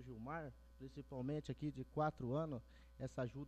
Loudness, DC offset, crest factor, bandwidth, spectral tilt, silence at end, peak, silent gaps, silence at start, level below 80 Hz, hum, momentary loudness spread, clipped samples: -46 LUFS; under 0.1%; 18 dB; 9 kHz; -8 dB/octave; 0 s; -28 dBFS; none; 0 s; -64 dBFS; none; 14 LU; under 0.1%